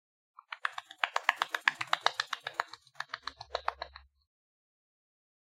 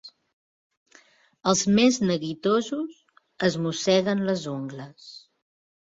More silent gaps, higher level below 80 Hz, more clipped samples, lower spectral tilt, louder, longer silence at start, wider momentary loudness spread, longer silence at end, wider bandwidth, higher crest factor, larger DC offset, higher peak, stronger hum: second, none vs 0.33-0.70 s, 0.77-0.86 s; about the same, -68 dBFS vs -64 dBFS; neither; second, 0 dB/octave vs -4.5 dB/octave; second, -34 LUFS vs -24 LUFS; first, 0.5 s vs 0.05 s; second, 15 LU vs 18 LU; first, 1.45 s vs 0.65 s; first, 16 kHz vs 7.8 kHz; first, 34 dB vs 20 dB; neither; about the same, -4 dBFS vs -6 dBFS; neither